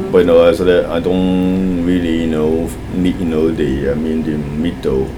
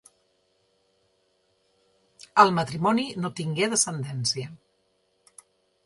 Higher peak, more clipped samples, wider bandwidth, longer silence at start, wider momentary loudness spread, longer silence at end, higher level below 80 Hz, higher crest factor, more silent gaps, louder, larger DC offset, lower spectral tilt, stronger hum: about the same, 0 dBFS vs -2 dBFS; neither; first, 16.5 kHz vs 11.5 kHz; second, 0 s vs 2.35 s; second, 8 LU vs 11 LU; second, 0 s vs 1.3 s; first, -30 dBFS vs -68 dBFS; second, 14 dB vs 26 dB; neither; first, -15 LUFS vs -24 LUFS; neither; first, -7.5 dB/octave vs -3.5 dB/octave; neither